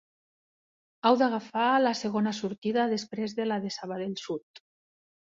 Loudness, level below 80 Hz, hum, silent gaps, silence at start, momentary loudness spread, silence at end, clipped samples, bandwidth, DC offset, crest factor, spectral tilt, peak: -28 LUFS; -74 dBFS; none; 2.58-2.62 s, 4.43-4.54 s; 1.05 s; 11 LU; 0.8 s; under 0.1%; 7.8 kHz; under 0.1%; 20 dB; -5 dB/octave; -10 dBFS